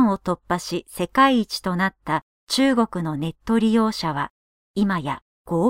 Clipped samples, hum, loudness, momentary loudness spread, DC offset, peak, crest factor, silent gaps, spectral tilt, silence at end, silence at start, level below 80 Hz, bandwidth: under 0.1%; none; -22 LUFS; 11 LU; under 0.1%; -4 dBFS; 18 dB; 2.22-2.47 s, 4.30-4.74 s, 5.22-5.45 s; -5.5 dB/octave; 0 s; 0 s; -50 dBFS; 16 kHz